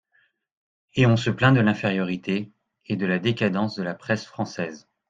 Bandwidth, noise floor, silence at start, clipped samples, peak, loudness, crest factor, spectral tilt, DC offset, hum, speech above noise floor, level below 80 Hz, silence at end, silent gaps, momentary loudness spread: 7.8 kHz; -66 dBFS; 0.95 s; under 0.1%; -2 dBFS; -24 LUFS; 22 dB; -7 dB/octave; under 0.1%; none; 44 dB; -58 dBFS; 0.3 s; none; 12 LU